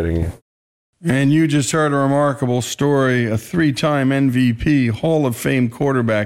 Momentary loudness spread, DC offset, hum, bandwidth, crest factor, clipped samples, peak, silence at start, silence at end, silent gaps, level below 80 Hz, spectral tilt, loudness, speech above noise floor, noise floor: 5 LU; under 0.1%; none; 16 kHz; 10 dB; under 0.1%; -6 dBFS; 0 s; 0 s; 0.42-0.93 s; -38 dBFS; -6 dB/octave; -17 LUFS; over 74 dB; under -90 dBFS